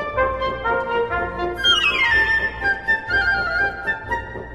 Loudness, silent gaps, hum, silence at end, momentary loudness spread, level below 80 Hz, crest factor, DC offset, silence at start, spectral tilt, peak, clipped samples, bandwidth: -19 LUFS; none; none; 0 s; 9 LU; -38 dBFS; 14 dB; under 0.1%; 0 s; -3 dB/octave; -6 dBFS; under 0.1%; 14.5 kHz